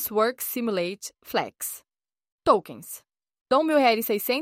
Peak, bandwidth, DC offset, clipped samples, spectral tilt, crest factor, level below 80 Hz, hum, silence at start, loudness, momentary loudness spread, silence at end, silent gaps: -6 dBFS; 16.5 kHz; under 0.1%; under 0.1%; -3.5 dB/octave; 20 dB; -64 dBFS; none; 0 s; -25 LUFS; 18 LU; 0 s; 2.32-2.38 s, 3.41-3.46 s